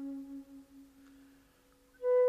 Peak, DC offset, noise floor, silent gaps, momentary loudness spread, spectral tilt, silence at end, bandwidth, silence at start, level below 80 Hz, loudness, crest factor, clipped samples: -22 dBFS; under 0.1%; -66 dBFS; none; 23 LU; -6 dB/octave; 0 s; 5.4 kHz; 0 s; -74 dBFS; -38 LUFS; 14 dB; under 0.1%